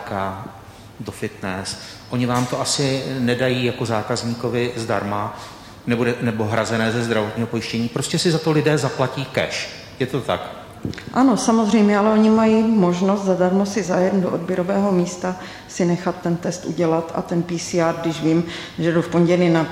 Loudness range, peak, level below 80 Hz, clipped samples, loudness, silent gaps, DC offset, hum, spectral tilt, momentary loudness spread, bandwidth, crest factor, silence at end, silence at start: 5 LU; -4 dBFS; -52 dBFS; under 0.1%; -20 LUFS; none; under 0.1%; none; -5.5 dB/octave; 12 LU; 15.5 kHz; 14 dB; 0 s; 0 s